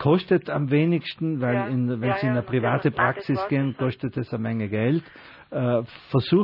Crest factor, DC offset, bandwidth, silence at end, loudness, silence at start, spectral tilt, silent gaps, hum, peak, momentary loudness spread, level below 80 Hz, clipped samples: 16 dB; under 0.1%; 5.6 kHz; 0 s; -24 LUFS; 0 s; -10.5 dB/octave; none; none; -6 dBFS; 6 LU; -60 dBFS; under 0.1%